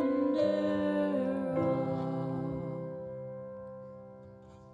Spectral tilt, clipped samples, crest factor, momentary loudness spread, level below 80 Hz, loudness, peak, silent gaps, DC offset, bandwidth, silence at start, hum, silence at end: -9 dB/octave; under 0.1%; 14 dB; 20 LU; -64 dBFS; -33 LUFS; -18 dBFS; none; under 0.1%; 10 kHz; 0 s; none; 0 s